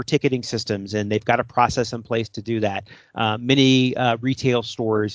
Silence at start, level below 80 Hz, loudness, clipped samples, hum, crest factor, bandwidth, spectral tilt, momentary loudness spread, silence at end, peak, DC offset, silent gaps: 0 s; -52 dBFS; -21 LUFS; under 0.1%; none; 20 dB; 8 kHz; -5.5 dB/octave; 9 LU; 0 s; -2 dBFS; under 0.1%; none